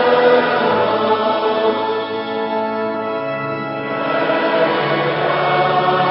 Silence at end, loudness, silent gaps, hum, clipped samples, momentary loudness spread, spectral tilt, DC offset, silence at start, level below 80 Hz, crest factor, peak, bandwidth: 0 s; -17 LUFS; none; none; under 0.1%; 8 LU; -10.5 dB/octave; under 0.1%; 0 s; -58 dBFS; 16 dB; 0 dBFS; 5.8 kHz